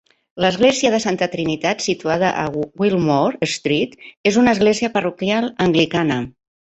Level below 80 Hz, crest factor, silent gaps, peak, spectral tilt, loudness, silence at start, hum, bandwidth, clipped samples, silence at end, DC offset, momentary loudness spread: -52 dBFS; 16 dB; 4.17-4.24 s; -2 dBFS; -5 dB/octave; -18 LUFS; 0.35 s; none; 8.4 kHz; under 0.1%; 0.35 s; under 0.1%; 7 LU